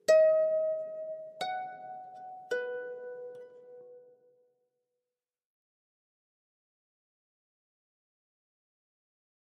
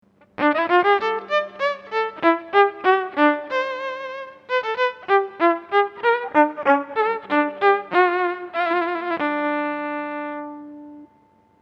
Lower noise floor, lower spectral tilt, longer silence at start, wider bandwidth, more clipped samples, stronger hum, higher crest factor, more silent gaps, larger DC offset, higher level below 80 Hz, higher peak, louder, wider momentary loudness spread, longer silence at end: first, under -90 dBFS vs -57 dBFS; second, -2 dB/octave vs -5 dB/octave; second, 0.1 s vs 0.4 s; first, 9.4 kHz vs 7 kHz; neither; neither; about the same, 22 dB vs 20 dB; neither; neither; second, under -90 dBFS vs -72 dBFS; second, -14 dBFS vs 0 dBFS; second, -31 LUFS vs -21 LUFS; first, 25 LU vs 11 LU; first, 5.5 s vs 0.55 s